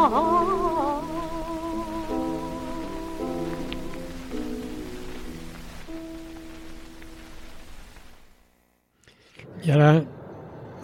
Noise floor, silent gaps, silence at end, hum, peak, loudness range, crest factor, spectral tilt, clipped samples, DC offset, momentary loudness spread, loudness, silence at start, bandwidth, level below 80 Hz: -65 dBFS; none; 0 s; none; -6 dBFS; 17 LU; 22 dB; -7.5 dB/octave; under 0.1%; under 0.1%; 24 LU; -26 LUFS; 0 s; 16.5 kHz; -44 dBFS